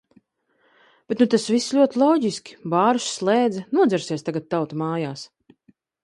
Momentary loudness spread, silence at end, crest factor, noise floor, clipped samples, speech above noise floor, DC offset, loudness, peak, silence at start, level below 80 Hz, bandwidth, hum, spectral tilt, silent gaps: 11 LU; 0.8 s; 18 dB; -66 dBFS; under 0.1%; 45 dB; under 0.1%; -21 LUFS; -4 dBFS; 1.1 s; -70 dBFS; 11.5 kHz; none; -5 dB/octave; none